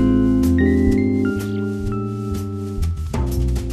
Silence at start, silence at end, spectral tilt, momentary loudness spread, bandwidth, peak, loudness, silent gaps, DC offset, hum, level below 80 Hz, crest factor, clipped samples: 0 s; 0 s; -8 dB/octave; 9 LU; 14 kHz; -4 dBFS; -20 LUFS; none; under 0.1%; none; -26 dBFS; 14 dB; under 0.1%